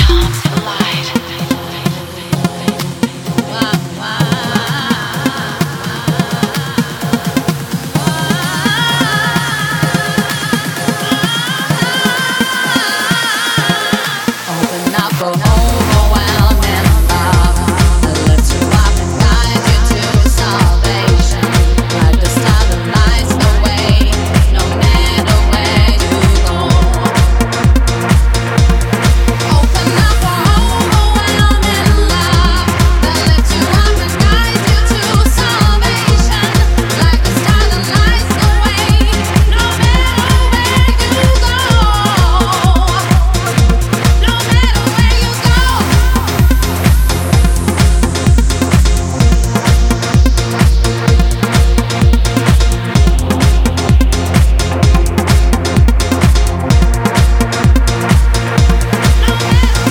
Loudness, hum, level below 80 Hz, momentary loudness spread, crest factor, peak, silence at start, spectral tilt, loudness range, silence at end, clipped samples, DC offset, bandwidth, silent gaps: -12 LUFS; none; -14 dBFS; 5 LU; 10 dB; 0 dBFS; 0 s; -5 dB/octave; 4 LU; 0 s; under 0.1%; under 0.1%; 18 kHz; none